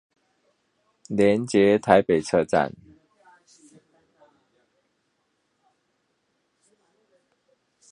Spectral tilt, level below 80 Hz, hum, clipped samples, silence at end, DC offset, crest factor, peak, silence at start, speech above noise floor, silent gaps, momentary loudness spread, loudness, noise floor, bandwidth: -6 dB/octave; -60 dBFS; none; under 0.1%; 5.2 s; under 0.1%; 26 dB; 0 dBFS; 1.1 s; 53 dB; none; 7 LU; -21 LUFS; -73 dBFS; 10.5 kHz